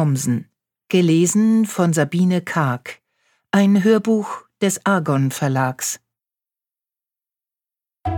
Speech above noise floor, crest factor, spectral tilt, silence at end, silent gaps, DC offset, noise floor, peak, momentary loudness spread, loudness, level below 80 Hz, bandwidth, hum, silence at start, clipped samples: 72 dB; 16 dB; -5.5 dB/octave; 0 s; none; under 0.1%; -90 dBFS; -2 dBFS; 10 LU; -18 LUFS; -52 dBFS; 19 kHz; none; 0 s; under 0.1%